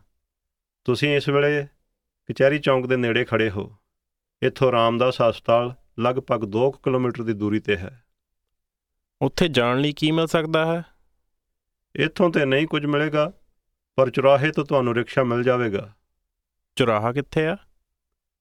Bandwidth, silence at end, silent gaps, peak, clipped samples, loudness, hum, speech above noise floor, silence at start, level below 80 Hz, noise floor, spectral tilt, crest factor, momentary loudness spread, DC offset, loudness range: 14.5 kHz; 0.85 s; none; -4 dBFS; under 0.1%; -22 LUFS; none; 62 dB; 0.85 s; -52 dBFS; -83 dBFS; -6.5 dB/octave; 20 dB; 8 LU; under 0.1%; 3 LU